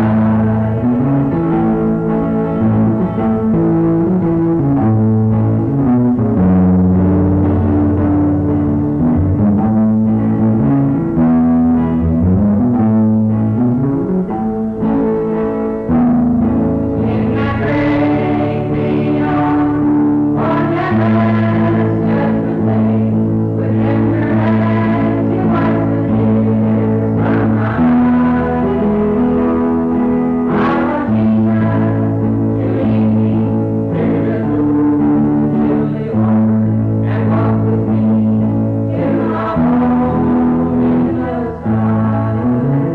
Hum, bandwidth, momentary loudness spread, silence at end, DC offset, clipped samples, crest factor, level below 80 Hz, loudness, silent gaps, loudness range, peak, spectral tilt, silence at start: none; 4.5 kHz; 3 LU; 0 s; under 0.1%; under 0.1%; 8 dB; -34 dBFS; -14 LUFS; none; 2 LU; -6 dBFS; -11 dB/octave; 0 s